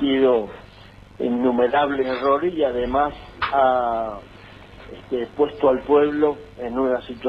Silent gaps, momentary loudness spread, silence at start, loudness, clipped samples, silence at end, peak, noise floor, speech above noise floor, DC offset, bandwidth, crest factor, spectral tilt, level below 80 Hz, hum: none; 13 LU; 0 s; -21 LUFS; under 0.1%; 0 s; -6 dBFS; -45 dBFS; 24 dB; under 0.1%; 5.8 kHz; 14 dB; -7.5 dB/octave; -46 dBFS; none